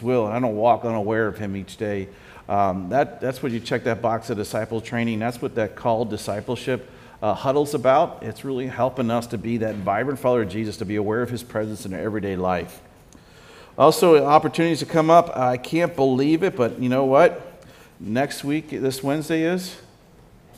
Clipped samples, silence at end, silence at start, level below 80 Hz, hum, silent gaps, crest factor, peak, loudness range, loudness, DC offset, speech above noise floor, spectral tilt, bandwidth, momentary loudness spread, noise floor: under 0.1%; 0.8 s; 0 s; -56 dBFS; none; none; 22 dB; 0 dBFS; 7 LU; -22 LUFS; under 0.1%; 29 dB; -6 dB/octave; 16 kHz; 12 LU; -50 dBFS